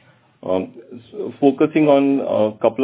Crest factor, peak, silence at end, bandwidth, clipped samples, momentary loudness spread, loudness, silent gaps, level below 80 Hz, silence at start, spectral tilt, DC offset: 18 dB; 0 dBFS; 0 s; 4 kHz; under 0.1%; 18 LU; -17 LUFS; none; -60 dBFS; 0.45 s; -11 dB/octave; under 0.1%